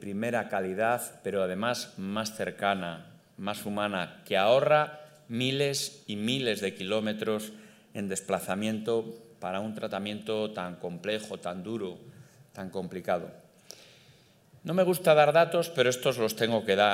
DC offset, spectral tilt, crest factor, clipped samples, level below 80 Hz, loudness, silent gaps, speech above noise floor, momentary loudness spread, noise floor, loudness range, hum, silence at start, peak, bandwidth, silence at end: under 0.1%; -4.5 dB/octave; 22 dB; under 0.1%; -76 dBFS; -29 LUFS; none; 31 dB; 15 LU; -60 dBFS; 9 LU; none; 0 s; -8 dBFS; 16 kHz; 0 s